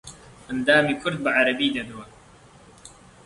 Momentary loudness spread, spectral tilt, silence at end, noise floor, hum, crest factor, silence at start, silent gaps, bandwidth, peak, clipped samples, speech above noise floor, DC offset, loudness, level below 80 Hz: 20 LU; -4.5 dB/octave; 0.35 s; -50 dBFS; none; 22 dB; 0.05 s; none; 11.5 kHz; -4 dBFS; under 0.1%; 28 dB; under 0.1%; -22 LUFS; -56 dBFS